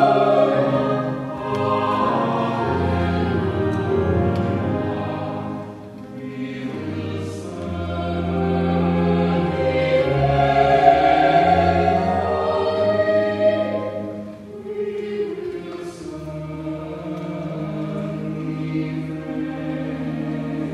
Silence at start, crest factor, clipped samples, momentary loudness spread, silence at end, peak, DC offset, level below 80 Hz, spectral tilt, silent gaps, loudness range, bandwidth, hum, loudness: 0 s; 20 dB; under 0.1%; 14 LU; 0 s; 0 dBFS; under 0.1%; -42 dBFS; -8 dB/octave; none; 12 LU; 11 kHz; none; -21 LUFS